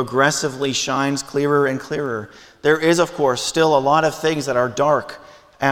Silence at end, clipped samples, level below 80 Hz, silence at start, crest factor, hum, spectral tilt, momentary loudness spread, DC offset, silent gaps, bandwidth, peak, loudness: 0 s; under 0.1%; -56 dBFS; 0 s; 16 dB; none; -4 dB/octave; 8 LU; under 0.1%; none; 17 kHz; -2 dBFS; -19 LUFS